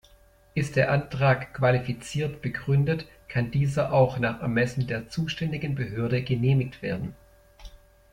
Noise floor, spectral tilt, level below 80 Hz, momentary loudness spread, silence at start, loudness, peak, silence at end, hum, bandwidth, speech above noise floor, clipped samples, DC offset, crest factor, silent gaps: -57 dBFS; -7 dB/octave; -50 dBFS; 8 LU; 0.55 s; -26 LUFS; -8 dBFS; 0.35 s; none; 11 kHz; 31 dB; under 0.1%; under 0.1%; 18 dB; none